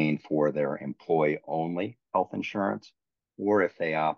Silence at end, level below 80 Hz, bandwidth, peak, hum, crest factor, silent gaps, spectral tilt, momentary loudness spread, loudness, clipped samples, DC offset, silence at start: 0.05 s; -76 dBFS; 6.8 kHz; -12 dBFS; none; 16 dB; none; -8 dB/octave; 7 LU; -29 LUFS; under 0.1%; under 0.1%; 0 s